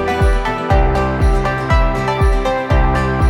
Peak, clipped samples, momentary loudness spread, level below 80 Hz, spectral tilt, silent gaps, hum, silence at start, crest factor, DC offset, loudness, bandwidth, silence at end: -2 dBFS; under 0.1%; 2 LU; -16 dBFS; -7 dB/octave; none; none; 0 s; 12 dB; under 0.1%; -16 LUFS; 11.5 kHz; 0 s